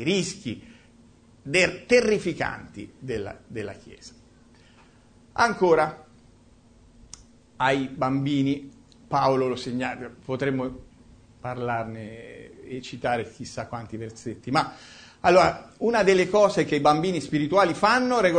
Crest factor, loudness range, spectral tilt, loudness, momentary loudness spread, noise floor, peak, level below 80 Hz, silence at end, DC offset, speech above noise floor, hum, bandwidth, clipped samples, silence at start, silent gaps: 20 dB; 11 LU; -5 dB/octave; -24 LUFS; 19 LU; -55 dBFS; -4 dBFS; -54 dBFS; 0 s; under 0.1%; 31 dB; none; 9.6 kHz; under 0.1%; 0 s; none